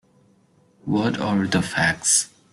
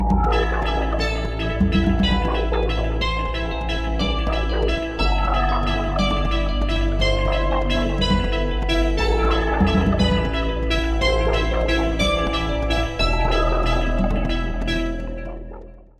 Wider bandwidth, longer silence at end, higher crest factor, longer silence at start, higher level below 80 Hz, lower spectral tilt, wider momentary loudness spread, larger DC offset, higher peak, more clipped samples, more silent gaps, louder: first, 12.5 kHz vs 9.2 kHz; about the same, 0.25 s vs 0.25 s; about the same, 18 dB vs 16 dB; first, 0.85 s vs 0 s; second, -54 dBFS vs -22 dBFS; second, -3 dB/octave vs -6 dB/octave; about the same, 6 LU vs 6 LU; second, under 0.1% vs 0.4%; about the same, -6 dBFS vs -4 dBFS; neither; neither; about the same, -21 LUFS vs -21 LUFS